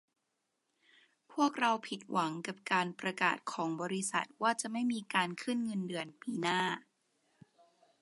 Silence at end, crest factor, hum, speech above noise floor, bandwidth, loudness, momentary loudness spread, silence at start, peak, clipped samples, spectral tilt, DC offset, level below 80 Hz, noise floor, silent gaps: 1.2 s; 22 dB; none; 49 dB; 11.5 kHz; -35 LUFS; 6 LU; 1.3 s; -14 dBFS; under 0.1%; -3.5 dB/octave; under 0.1%; -86 dBFS; -83 dBFS; none